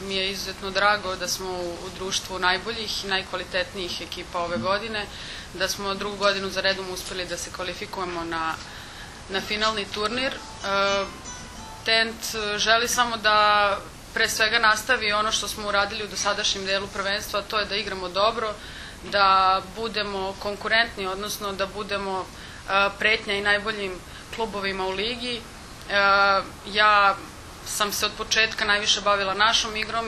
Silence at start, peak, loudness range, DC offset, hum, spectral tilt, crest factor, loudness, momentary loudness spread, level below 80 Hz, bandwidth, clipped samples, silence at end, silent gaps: 0 s; -4 dBFS; 6 LU; under 0.1%; none; -2 dB/octave; 22 dB; -24 LUFS; 13 LU; -48 dBFS; 13.5 kHz; under 0.1%; 0 s; none